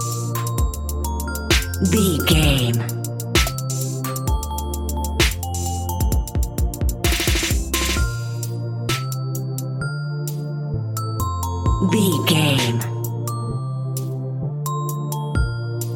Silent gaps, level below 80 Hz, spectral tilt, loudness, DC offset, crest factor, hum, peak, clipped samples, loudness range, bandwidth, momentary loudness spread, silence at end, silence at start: none; -28 dBFS; -4.5 dB/octave; -22 LUFS; under 0.1%; 18 dB; none; -2 dBFS; under 0.1%; 5 LU; 17 kHz; 9 LU; 0 s; 0 s